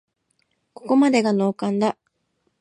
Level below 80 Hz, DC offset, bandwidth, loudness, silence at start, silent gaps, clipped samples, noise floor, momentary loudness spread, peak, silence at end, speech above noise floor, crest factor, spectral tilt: -74 dBFS; under 0.1%; 11 kHz; -20 LUFS; 0.85 s; none; under 0.1%; -71 dBFS; 16 LU; -6 dBFS; 0.7 s; 52 dB; 16 dB; -6 dB/octave